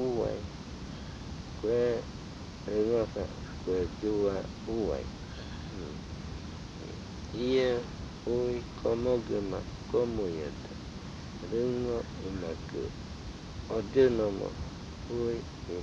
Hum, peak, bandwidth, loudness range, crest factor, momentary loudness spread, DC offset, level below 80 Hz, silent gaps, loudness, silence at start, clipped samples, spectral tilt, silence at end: none; -14 dBFS; 8.4 kHz; 4 LU; 20 dB; 14 LU; under 0.1%; -48 dBFS; none; -34 LUFS; 0 s; under 0.1%; -6.5 dB/octave; 0 s